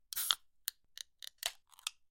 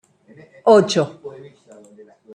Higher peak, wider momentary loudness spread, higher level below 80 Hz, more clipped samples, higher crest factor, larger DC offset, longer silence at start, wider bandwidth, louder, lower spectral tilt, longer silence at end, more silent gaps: second, -8 dBFS vs 0 dBFS; second, 15 LU vs 24 LU; second, -78 dBFS vs -64 dBFS; neither; first, 34 dB vs 20 dB; neither; second, 0.15 s vs 0.65 s; first, 17 kHz vs 10 kHz; second, -39 LUFS vs -16 LUFS; second, 4 dB/octave vs -5 dB/octave; second, 0.2 s vs 1.05 s; neither